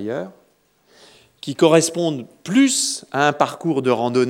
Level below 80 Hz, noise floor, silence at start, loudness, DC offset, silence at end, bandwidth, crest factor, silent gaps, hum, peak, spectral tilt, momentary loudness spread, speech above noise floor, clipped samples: -74 dBFS; -59 dBFS; 0 s; -18 LUFS; under 0.1%; 0 s; 16.5 kHz; 20 dB; none; none; 0 dBFS; -4 dB/octave; 15 LU; 41 dB; under 0.1%